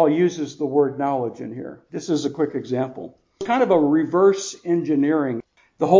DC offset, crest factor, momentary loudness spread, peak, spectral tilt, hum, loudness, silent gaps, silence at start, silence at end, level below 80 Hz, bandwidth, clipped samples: under 0.1%; 18 dB; 15 LU; -2 dBFS; -6 dB/octave; none; -21 LUFS; none; 0 s; 0 s; -66 dBFS; 7.6 kHz; under 0.1%